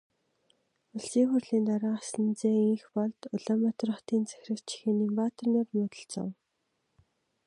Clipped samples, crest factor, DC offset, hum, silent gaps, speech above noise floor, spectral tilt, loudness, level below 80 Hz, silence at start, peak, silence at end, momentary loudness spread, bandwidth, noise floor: under 0.1%; 16 dB; under 0.1%; none; none; 50 dB; -6.5 dB/octave; -30 LUFS; -80 dBFS; 0.95 s; -14 dBFS; 1.15 s; 11 LU; 11 kHz; -79 dBFS